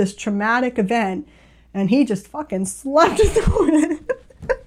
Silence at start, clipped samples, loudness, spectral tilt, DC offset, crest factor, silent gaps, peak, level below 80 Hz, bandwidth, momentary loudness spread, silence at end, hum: 0 s; under 0.1%; -19 LUFS; -5.5 dB/octave; under 0.1%; 16 dB; none; -2 dBFS; -32 dBFS; 15 kHz; 11 LU; 0.05 s; none